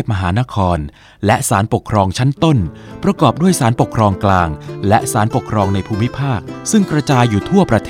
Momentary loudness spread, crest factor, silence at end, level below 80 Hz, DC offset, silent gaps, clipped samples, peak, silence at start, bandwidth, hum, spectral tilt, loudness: 7 LU; 14 dB; 0 s; -36 dBFS; under 0.1%; none; under 0.1%; 0 dBFS; 0 s; 16.5 kHz; none; -6 dB/octave; -15 LUFS